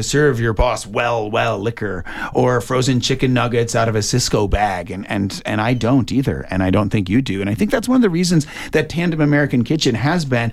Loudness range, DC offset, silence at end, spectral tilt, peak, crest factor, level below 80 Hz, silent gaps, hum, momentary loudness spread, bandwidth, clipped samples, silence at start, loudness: 1 LU; under 0.1%; 0 s; -5.5 dB/octave; -4 dBFS; 12 dB; -32 dBFS; none; none; 6 LU; 15 kHz; under 0.1%; 0 s; -18 LUFS